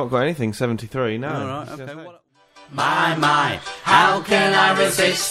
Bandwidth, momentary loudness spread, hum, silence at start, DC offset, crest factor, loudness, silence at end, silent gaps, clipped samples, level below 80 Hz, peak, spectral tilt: 16 kHz; 17 LU; none; 0 s; under 0.1%; 18 dB; -18 LUFS; 0 s; none; under 0.1%; -56 dBFS; -2 dBFS; -3.5 dB/octave